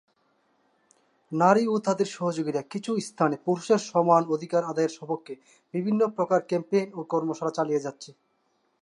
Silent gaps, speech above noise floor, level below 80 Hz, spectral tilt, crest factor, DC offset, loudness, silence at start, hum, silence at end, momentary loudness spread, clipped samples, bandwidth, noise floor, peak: none; 46 dB; -80 dBFS; -6 dB/octave; 20 dB; under 0.1%; -26 LUFS; 1.3 s; none; 0.7 s; 13 LU; under 0.1%; 11.5 kHz; -71 dBFS; -6 dBFS